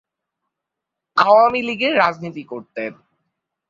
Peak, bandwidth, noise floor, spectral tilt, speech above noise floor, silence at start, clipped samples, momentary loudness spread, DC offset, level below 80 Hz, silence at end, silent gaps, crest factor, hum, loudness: -2 dBFS; 7.4 kHz; -83 dBFS; -5.5 dB/octave; 65 dB; 1.15 s; under 0.1%; 18 LU; under 0.1%; -62 dBFS; 0.75 s; none; 18 dB; none; -16 LUFS